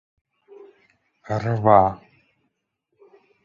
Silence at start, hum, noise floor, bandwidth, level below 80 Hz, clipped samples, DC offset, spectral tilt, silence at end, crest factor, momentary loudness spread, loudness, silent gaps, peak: 1.3 s; none; -76 dBFS; 7.2 kHz; -52 dBFS; under 0.1%; under 0.1%; -9 dB/octave; 1.5 s; 22 dB; 15 LU; -19 LUFS; none; -2 dBFS